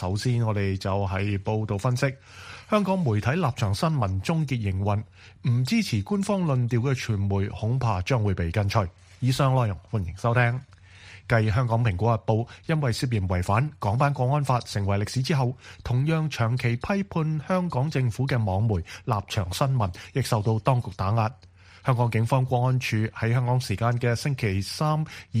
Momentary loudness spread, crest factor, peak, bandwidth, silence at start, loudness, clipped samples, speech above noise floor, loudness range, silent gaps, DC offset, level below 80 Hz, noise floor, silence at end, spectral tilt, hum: 5 LU; 18 dB; -8 dBFS; 15 kHz; 0 s; -26 LUFS; under 0.1%; 23 dB; 1 LU; none; under 0.1%; -50 dBFS; -48 dBFS; 0 s; -6.5 dB/octave; none